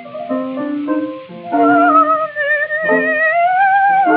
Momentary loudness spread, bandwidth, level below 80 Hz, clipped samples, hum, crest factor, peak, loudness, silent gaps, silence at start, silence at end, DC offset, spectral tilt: 11 LU; 4.6 kHz; -72 dBFS; under 0.1%; none; 14 dB; 0 dBFS; -14 LUFS; none; 0 s; 0 s; under 0.1%; -3 dB/octave